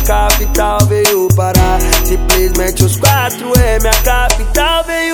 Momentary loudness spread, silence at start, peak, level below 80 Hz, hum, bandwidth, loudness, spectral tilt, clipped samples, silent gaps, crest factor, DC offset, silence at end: 3 LU; 0 s; 0 dBFS; -16 dBFS; none; over 20 kHz; -11 LUFS; -4 dB/octave; 0.5%; none; 10 dB; under 0.1%; 0 s